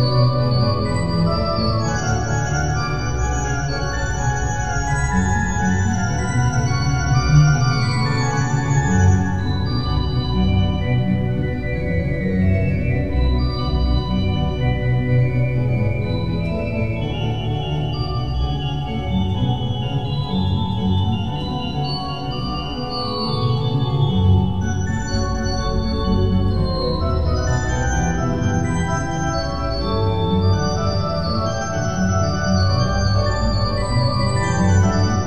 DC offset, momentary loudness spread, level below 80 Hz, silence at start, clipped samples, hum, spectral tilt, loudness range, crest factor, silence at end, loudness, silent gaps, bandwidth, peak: 2%; 6 LU; -28 dBFS; 0 s; under 0.1%; none; -6 dB/octave; 4 LU; 16 dB; 0 s; -20 LUFS; none; 8.4 kHz; -2 dBFS